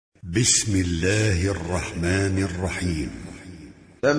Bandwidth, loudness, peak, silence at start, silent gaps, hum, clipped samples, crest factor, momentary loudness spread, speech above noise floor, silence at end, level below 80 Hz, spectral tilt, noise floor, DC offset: 10.5 kHz; -23 LUFS; -6 dBFS; 0.25 s; none; none; under 0.1%; 18 dB; 17 LU; 22 dB; 0 s; -40 dBFS; -4 dB/octave; -45 dBFS; under 0.1%